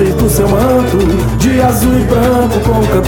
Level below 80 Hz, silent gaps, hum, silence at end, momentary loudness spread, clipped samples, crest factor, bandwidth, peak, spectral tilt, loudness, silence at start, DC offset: -20 dBFS; none; none; 0 s; 2 LU; under 0.1%; 10 dB; 18 kHz; 0 dBFS; -6.5 dB/octave; -11 LUFS; 0 s; under 0.1%